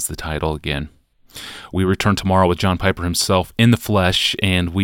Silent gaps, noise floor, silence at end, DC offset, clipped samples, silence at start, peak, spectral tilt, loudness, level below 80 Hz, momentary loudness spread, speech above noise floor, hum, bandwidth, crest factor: none; -39 dBFS; 0 s; under 0.1%; under 0.1%; 0 s; -2 dBFS; -4.5 dB/octave; -18 LUFS; -36 dBFS; 11 LU; 22 dB; none; 17 kHz; 18 dB